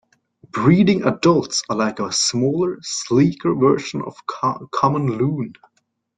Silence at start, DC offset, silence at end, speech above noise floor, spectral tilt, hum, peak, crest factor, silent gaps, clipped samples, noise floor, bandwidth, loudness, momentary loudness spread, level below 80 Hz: 0.55 s; under 0.1%; 0.65 s; 50 dB; -5 dB/octave; none; -2 dBFS; 18 dB; none; under 0.1%; -68 dBFS; 9.4 kHz; -19 LUFS; 11 LU; -56 dBFS